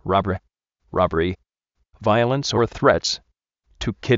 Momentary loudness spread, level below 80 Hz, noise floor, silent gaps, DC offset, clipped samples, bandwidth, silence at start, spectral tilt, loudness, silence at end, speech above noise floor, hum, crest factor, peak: 11 LU; -44 dBFS; -73 dBFS; none; under 0.1%; under 0.1%; 8 kHz; 0.05 s; -4.5 dB/octave; -22 LUFS; 0 s; 53 dB; none; 20 dB; -2 dBFS